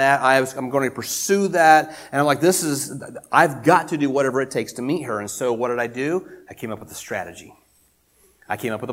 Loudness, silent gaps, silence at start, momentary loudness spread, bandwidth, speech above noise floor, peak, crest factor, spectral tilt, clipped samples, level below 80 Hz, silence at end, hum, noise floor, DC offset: -20 LUFS; none; 0 s; 15 LU; 16.5 kHz; 40 dB; 0 dBFS; 20 dB; -4 dB/octave; under 0.1%; -64 dBFS; 0 s; none; -61 dBFS; under 0.1%